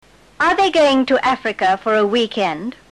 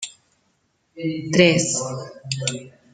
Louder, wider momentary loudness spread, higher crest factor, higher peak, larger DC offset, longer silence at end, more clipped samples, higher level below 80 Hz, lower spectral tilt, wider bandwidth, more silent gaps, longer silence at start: first, -16 LUFS vs -21 LUFS; second, 7 LU vs 18 LU; second, 12 dB vs 22 dB; about the same, -4 dBFS vs -2 dBFS; neither; about the same, 0.2 s vs 0.25 s; neither; first, -52 dBFS vs -62 dBFS; about the same, -4 dB/octave vs -4 dB/octave; first, 11.5 kHz vs 9.6 kHz; neither; first, 0.4 s vs 0 s